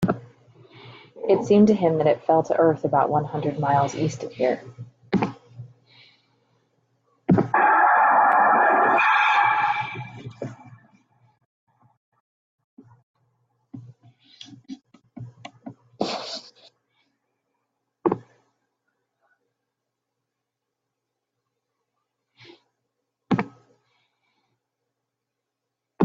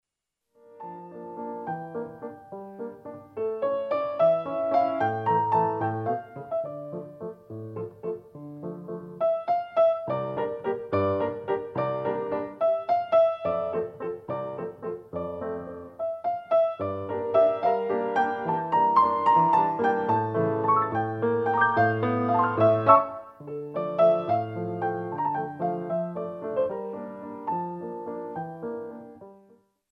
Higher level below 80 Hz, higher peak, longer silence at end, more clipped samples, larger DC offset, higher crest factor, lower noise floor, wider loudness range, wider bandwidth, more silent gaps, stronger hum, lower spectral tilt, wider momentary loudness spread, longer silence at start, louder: about the same, -66 dBFS vs -68 dBFS; about the same, -6 dBFS vs -4 dBFS; second, 0 s vs 0.55 s; neither; neither; about the same, 20 dB vs 22 dB; about the same, -83 dBFS vs -84 dBFS; first, 18 LU vs 10 LU; first, 7.8 kHz vs 5.8 kHz; first, 11.45-11.67 s, 11.97-12.12 s, 12.20-12.58 s, 12.64-12.77 s, 13.03-13.14 s vs none; neither; second, -6.5 dB/octave vs -9 dB/octave; first, 24 LU vs 17 LU; second, 0 s vs 0.7 s; first, -21 LUFS vs -26 LUFS